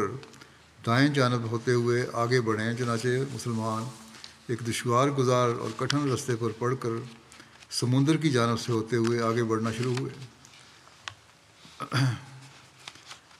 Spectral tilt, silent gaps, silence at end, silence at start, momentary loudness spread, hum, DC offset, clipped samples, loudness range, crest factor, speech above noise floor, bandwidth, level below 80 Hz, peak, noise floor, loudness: -5.5 dB/octave; none; 0.2 s; 0 s; 20 LU; none; under 0.1%; under 0.1%; 5 LU; 22 dB; 30 dB; 14 kHz; -70 dBFS; -6 dBFS; -56 dBFS; -27 LUFS